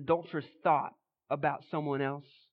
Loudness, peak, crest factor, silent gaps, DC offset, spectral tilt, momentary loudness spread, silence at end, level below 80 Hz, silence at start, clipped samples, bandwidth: -33 LUFS; -14 dBFS; 18 dB; none; under 0.1%; -10 dB/octave; 11 LU; 0.3 s; -72 dBFS; 0 s; under 0.1%; 5.4 kHz